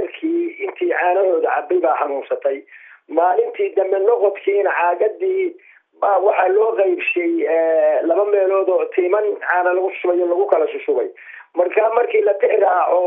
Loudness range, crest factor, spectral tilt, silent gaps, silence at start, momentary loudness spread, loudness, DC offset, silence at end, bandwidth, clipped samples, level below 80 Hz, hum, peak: 2 LU; 16 dB; -6.5 dB/octave; none; 0 s; 6 LU; -18 LUFS; under 0.1%; 0 s; 3.8 kHz; under 0.1%; -88 dBFS; none; -2 dBFS